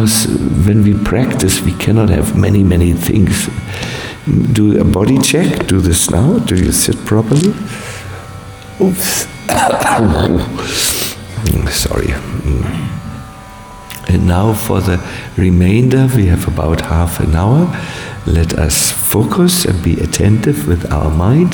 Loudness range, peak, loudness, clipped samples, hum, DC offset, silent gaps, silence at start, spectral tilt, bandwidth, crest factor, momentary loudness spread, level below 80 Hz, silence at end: 5 LU; 0 dBFS; -13 LUFS; under 0.1%; none; under 0.1%; none; 0 s; -5 dB/octave; 19.5 kHz; 12 dB; 11 LU; -24 dBFS; 0 s